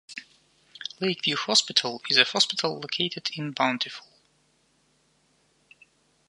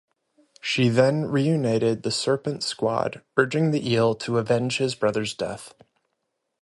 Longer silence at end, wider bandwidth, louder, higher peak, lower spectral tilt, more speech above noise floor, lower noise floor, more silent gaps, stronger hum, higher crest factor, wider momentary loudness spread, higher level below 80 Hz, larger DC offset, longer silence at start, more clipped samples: first, 2.3 s vs 0.9 s; about the same, 11.5 kHz vs 11.5 kHz; about the same, -24 LUFS vs -24 LUFS; about the same, -2 dBFS vs -2 dBFS; second, -2 dB/octave vs -5.5 dB/octave; second, 41 dB vs 55 dB; second, -67 dBFS vs -78 dBFS; neither; neither; first, 28 dB vs 22 dB; first, 18 LU vs 7 LU; second, -78 dBFS vs -62 dBFS; neither; second, 0.1 s vs 0.65 s; neither